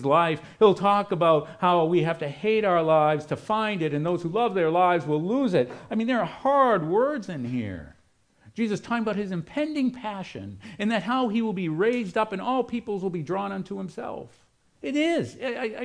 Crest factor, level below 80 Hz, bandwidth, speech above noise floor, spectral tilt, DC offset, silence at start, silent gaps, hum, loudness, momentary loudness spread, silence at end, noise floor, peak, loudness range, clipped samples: 18 dB; -62 dBFS; 10.5 kHz; 38 dB; -7 dB/octave; under 0.1%; 0 s; none; none; -25 LUFS; 13 LU; 0 s; -62 dBFS; -6 dBFS; 7 LU; under 0.1%